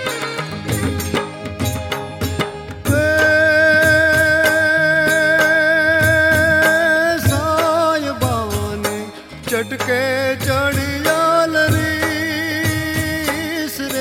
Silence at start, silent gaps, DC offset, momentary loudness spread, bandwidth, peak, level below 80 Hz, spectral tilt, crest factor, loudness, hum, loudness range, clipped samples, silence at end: 0 s; none; under 0.1%; 11 LU; 17 kHz; -2 dBFS; -44 dBFS; -4.5 dB/octave; 14 dB; -16 LUFS; none; 6 LU; under 0.1%; 0 s